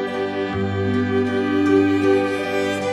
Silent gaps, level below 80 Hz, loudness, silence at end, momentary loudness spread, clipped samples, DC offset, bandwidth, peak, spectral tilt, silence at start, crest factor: none; -56 dBFS; -20 LUFS; 0 s; 7 LU; under 0.1%; under 0.1%; 12 kHz; -6 dBFS; -6.5 dB/octave; 0 s; 14 dB